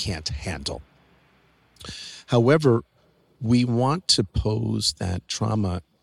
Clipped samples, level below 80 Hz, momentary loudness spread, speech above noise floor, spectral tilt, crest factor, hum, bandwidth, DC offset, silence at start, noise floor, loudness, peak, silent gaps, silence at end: under 0.1%; -42 dBFS; 17 LU; 37 dB; -5 dB/octave; 18 dB; none; 13 kHz; under 0.1%; 0 s; -60 dBFS; -23 LUFS; -6 dBFS; none; 0.2 s